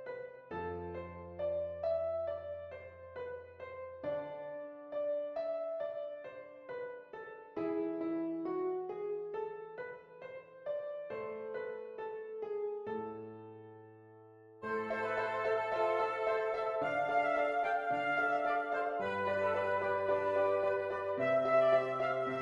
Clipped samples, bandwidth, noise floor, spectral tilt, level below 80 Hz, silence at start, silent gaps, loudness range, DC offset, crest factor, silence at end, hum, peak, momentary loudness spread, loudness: under 0.1%; 7.6 kHz; -58 dBFS; -6.5 dB/octave; -72 dBFS; 0 s; none; 9 LU; under 0.1%; 18 dB; 0 s; none; -18 dBFS; 16 LU; -36 LUFS